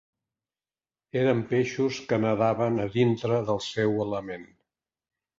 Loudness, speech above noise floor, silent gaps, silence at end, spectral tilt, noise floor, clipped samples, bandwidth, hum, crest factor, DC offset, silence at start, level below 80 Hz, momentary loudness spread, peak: -26 LUFS; over 64 dB; none; 0.95 s; -6.5 dB/octave; under -90 dBFS; under 0.1%; 7.8 kHz; none; 18 dB; under 0.1%; 1.15 s; -62 dBFS; 8 LU; -10 dBFS